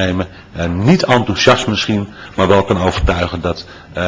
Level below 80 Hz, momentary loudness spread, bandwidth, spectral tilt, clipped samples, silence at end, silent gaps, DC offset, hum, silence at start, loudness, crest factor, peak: -28 dBFS; 12 LU; 8 kHz; -5.5 dB/octave; 0.1%; 0 s; none; under 0.1%; none; 0 s; -14 LUFS; 14 dB; 0 dBFS